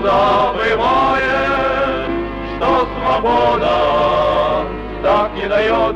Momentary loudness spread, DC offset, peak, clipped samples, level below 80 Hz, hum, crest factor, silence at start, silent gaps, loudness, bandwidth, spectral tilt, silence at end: 7 LU; under 0.1%; -4 dBFS; under 0.1%; -32 dBFS; none; 10 dB; 0 s; none; -15 LUFS; 9.2 kHz; -6 dB/octave; 0 s